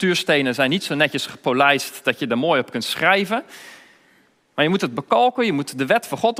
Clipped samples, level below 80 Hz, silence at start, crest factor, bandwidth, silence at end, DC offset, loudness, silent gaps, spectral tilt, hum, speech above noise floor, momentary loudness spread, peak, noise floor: under 0.1%; -68 dBFS; 0 s; 20 dB; 16 kHz; 0 s; under 0.1%; -19 LUFS; none; -4 dB/octave; none; 38 dB; 7 LU; 0 dBFS; -58 dBFS